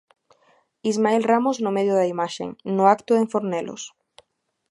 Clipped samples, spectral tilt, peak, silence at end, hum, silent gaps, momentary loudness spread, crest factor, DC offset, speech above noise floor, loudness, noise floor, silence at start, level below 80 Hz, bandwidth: under 0.1%; -5.5 dB/octave; -2 dBFS; 0.8 s; none; none; 12 LU; 20 dB; under 0.1%; 50 dB; -22 LUFS; -71 dBFS; 0.85 s; -72 dBFS; 11.5 kHz